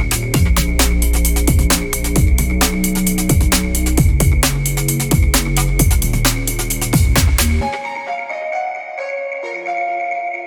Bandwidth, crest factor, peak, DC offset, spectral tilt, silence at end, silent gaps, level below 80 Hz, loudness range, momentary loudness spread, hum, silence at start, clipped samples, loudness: over 20 kHz; 14 dB; 0 dBFS; under 0.1%; -4.5 dB/octave; 0 s; none; -18 dBFS; 3 LU; 9 LU; none; 0 s; under 0.1%; -16 LUFS